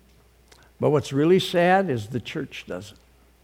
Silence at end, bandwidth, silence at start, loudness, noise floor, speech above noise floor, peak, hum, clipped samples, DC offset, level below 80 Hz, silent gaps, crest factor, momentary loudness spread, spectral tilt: 0.55 s; 16 kHz; 0.8 s; -22 LUFS; -56 dBFS; 34 dB; -6 dBFS; none; under 0.1%; under 0.1%; -58 dBFS; none; 18 dB; 15 LU; -6 dB/octave